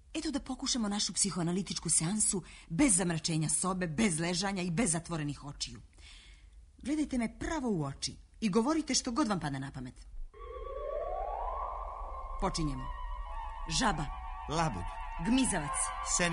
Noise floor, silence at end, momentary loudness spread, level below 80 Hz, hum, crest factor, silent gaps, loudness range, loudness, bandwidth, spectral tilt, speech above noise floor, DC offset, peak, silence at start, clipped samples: -55 dBFS; 0 s; 14 LU; -46 dBFS; none; 20 dB; none; 9 LU; -33 LUFS; 11 kHz; -3.5 dB/octave; 23 dB; under 0.1%; -14 dBFS; 0.05 s; under 0.1%